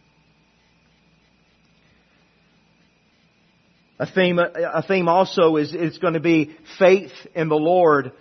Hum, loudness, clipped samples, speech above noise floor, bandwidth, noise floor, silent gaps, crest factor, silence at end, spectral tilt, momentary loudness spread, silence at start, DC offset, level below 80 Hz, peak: none; -19 LUFS; under 0.1%; 42 dB; 6.4 kHz; -60 dBFS; none; 20 dB; 0.1 s; -7 dB/octave; 9 LU; 4 s; under 0.1%; -68 dBFS; -2 dBFS